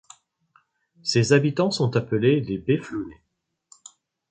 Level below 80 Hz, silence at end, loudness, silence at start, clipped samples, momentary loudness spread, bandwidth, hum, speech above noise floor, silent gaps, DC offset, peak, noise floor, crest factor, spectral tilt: -58 dBFS; 1.2 s; -23 LUFS; 1.05 s; under 0.1%; 13 LU; 9.4 kHz; none; 42 dB; none; under 0.1%; -4 dBFS; -64 dBFS; 20 dB; -6 dB/octave